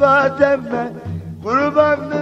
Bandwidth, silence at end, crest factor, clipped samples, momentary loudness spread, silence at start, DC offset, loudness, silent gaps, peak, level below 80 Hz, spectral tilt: 7.8 kHz; 0 s; 16 dB; under 0.1%; 14 LU; 0 s; under 0.1%; -16 LUFS; none; 0 dBFS; -52 dBFS; -7 dB/octave